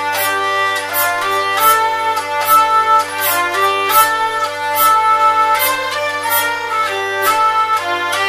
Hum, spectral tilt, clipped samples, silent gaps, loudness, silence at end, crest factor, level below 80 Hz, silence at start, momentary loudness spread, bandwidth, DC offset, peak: none; -0.5 dB/octave; under 0.1%; none; -13 LUFS; 0 s; 14 dB; -60 dBFS; 0 s; 6 LU; 16 kHz; under 0.1%; 0 dBFS